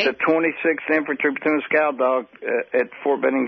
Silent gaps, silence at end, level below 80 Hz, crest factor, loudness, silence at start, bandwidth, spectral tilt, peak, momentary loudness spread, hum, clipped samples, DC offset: none; 0 s; -68 dBFS; 14 dB; -21 LUFS; 0 s; 6.2 kHz; -2.5 dB/octave; -6 dBFS; 5 LU; none; under 0.1%; under 0.1%